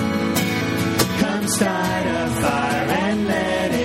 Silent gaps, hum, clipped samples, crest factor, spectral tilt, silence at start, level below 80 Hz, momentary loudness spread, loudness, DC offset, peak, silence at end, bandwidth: none; none; under 0.1%; 18 dB; -4.5 dB/octave; 0 s; -44 dBFS; 2 LU; -20 LUFS; under 0.1%; -2 dBFS; 0 s; 16.5 kHz